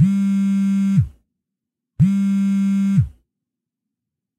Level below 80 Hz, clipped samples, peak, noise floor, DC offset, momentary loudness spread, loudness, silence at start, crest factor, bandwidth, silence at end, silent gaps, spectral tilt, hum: -44 dBFS; under 0.1%; -6 dBFS; -83 dBFS; under 0.1%; 4 LU; -18 LUFS; 0 s; 14 dB; 8.8 kHz; 1.3 s; none; -8.5 dB/octave; none